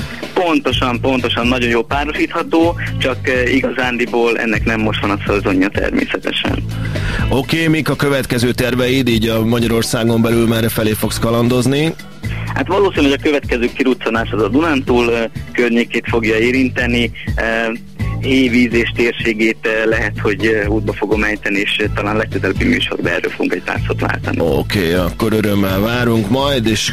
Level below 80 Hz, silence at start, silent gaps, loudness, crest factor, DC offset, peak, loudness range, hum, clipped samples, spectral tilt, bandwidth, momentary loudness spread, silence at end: -30 dBFS; 0 s; none; -15 LUFS; 14 dB; 2%; -2 dBFS; 2 LU; none; under 0.1%; -5.5 dB/octave; 16 kHz; 4 LU; 0 s